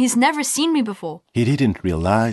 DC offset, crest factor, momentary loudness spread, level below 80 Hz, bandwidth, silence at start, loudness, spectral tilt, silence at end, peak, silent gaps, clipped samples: under 0.1%; 16 dB; 9 LU; -46 dBFS; 12.5 kHz; 0 s; -19 LUFS; -4.5 dB/octave; 0 s; -2 dBFS; none; under 0.1%